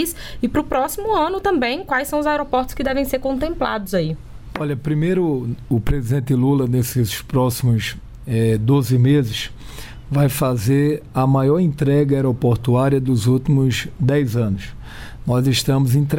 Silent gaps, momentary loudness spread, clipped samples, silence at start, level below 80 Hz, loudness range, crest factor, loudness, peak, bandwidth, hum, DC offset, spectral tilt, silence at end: none; 9 LU; under 0.1%; 0 s; -36 dBFS; 4 LU; 14 dB; -19 LUFS; -4 dBFS; 17 kHz; none; under 0.1%; -6.5 dB/octave; 0 s